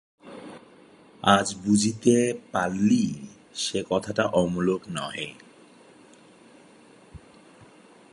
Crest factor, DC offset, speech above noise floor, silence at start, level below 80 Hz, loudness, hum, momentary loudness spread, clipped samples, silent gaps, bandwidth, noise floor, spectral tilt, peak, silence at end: 24 dB; under 0.1%; 29 dB; 0.25 s; -58 dBFS; -25 LUFS; none; 19 LU; under 0.1%; none; 11.5 kHz; -53 dBFS; -4.5 dB/octave; -2 dBFS; 0.5 s